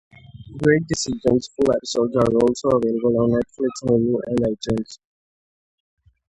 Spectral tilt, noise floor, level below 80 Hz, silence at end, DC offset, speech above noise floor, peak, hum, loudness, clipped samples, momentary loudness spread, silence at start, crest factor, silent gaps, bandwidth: -6 dB/octave; under -90 dBFS; -48 dBFS; 1.35 s; under 0.1%; over 70 dB; -2 dBFS; none; -20 LUFS; under 0.1%; 7 LU; 0.35 s; 18 dB; none; 11 kHz